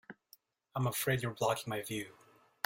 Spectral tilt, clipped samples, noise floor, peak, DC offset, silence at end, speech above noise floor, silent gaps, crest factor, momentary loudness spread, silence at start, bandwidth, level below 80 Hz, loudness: -4.5 dB/octave; under 0.1%; -67 dBFS; -14 dBFS; under 0.1%; 0.55 s; 31 dB; none; 24 dB; 12 LU; 0.1 s; 16.5 kHz; -68 dBFS; -36 LUFS